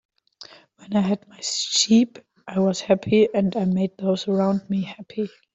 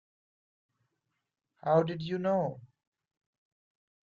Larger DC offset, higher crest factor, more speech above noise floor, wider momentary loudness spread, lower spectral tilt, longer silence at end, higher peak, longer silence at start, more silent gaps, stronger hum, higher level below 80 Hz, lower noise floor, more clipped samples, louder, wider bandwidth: neither; about the same, 18 dB vs 22 dB; second, 26 dB vs 55 dB; about the same, 12 LU vs 11 LU; second, -5 dB/octave vs -8.5 dB/octave; second, 0.25 s vs 1.4 s; first, -4 dBFS vs -14 dBFS; second, 0.4 s vs 1.65 s; neither; neither; first, -62 dBFS vs -74 dBFS; second, -47 dBFS vs -85 dBFS; neither; first, -22 LUFS vs -31 LUFS; first, 8.2 kHz vs 7.2 kHz